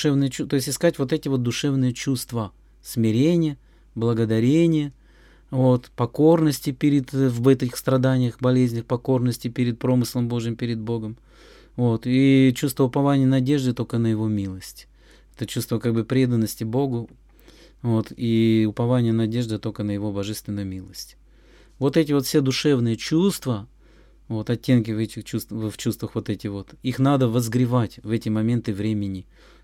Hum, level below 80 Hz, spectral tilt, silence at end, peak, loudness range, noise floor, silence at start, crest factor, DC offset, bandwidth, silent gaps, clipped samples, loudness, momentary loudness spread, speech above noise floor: none; -52 dBFS; -6.5 dB/octave; 0.4 s; -6 dBFS; 5 LU; -52 dBFS; 0 s; 16 dB; under 0.1%; 16.5 kHz; none; under 0.1%; -22 LUFS; 11 LU; 30 dB